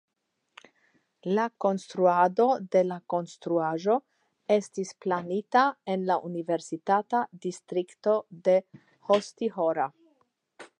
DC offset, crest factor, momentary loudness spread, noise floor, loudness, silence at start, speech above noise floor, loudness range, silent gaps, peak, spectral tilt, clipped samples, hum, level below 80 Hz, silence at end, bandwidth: under 0.1%; 18 dB; 9 LU; -80 dBFS; -27 LUFS; 1.25 s; 53 dB; 2 LU; none; -10 dBFS; -6 dB/octave; under 0.1%; none; -84 dBFS; 0.15 s; 10.5 kHz